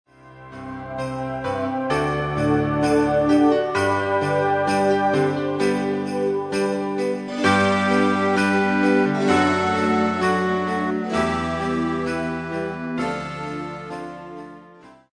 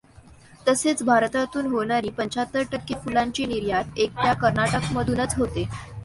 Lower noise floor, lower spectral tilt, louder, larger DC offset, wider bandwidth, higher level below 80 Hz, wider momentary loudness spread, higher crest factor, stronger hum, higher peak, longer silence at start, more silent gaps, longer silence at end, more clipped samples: about the same, -47 dBFS vs -49 dBFS; first, -6 dB/octave vs -4.5 dB/octave; first, -21 LUFS vs -24 LUFS; neither; about the same, 10.5 kHz vs 11.5 kHz; about the same, -48 dBFS vs -44 dBFS; first, 13 LU vs 7 LU; about the same, 18 dB vs 18 dB; neither; about the same, -4 dBFS vs -6 dBFS; about the same, 0.25 s vs 0.15 s; neither; first, 0.2 s vs 0 s; neither